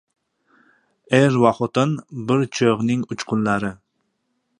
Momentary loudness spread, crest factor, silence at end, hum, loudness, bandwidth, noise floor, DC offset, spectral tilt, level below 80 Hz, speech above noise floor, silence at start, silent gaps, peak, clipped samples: 8 LU; 20 dB; 0.85 s; none; -20 LUFS; 11 kHz; -72 dBFS; under 0.1%; -6.5 dB/octave; -58 dBFS; 53 dB; 1.1 s; none; -2 dBFS; under 0.1%